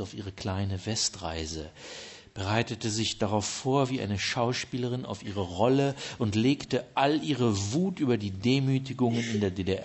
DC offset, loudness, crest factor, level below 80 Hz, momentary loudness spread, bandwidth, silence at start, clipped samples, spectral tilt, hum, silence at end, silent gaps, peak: under 0.1%; -29 LUFS; 18 dB; -56 dBFS; 10 LU; 8.4 kHz; 0 s; under 0.1%; -5 dB/octave; none; 0 s; none; -10 dBFS